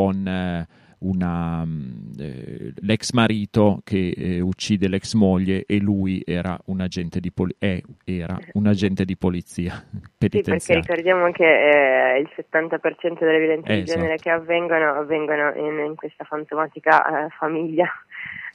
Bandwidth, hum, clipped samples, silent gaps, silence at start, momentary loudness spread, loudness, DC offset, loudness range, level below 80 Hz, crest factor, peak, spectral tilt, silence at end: 11.5 kHz; none; under 0.1%; none; 0 s; 13 LU; -21 LUFS; under 0.1%; 6 LU; -50 dBFS; 20 dB; -2 dBFS; -6.5 dB/octave; 0.05 s